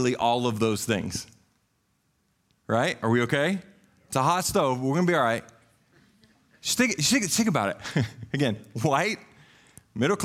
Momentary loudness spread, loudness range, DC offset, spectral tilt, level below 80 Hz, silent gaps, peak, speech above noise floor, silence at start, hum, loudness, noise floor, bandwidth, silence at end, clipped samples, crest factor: 9 LU; 3 LU; under 0.1%; -4 dB/octave; -60 dBFS; none; -10 dBFS; 46 dB; 0 s; none; -25 LUFS; -71 dBFS; 16 kHz; 0 s; under 0.1%; 18 dB